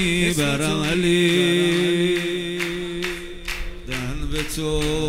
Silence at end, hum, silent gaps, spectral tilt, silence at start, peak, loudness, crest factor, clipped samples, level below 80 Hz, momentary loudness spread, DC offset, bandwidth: 0 s; none; none; -4.5 dB/octave; 0 s; -6 dBFS; -22 LUFS; 16 dB; under 0.1%; -34 dBFS; 13 LU; under 0.1%; 16 kHz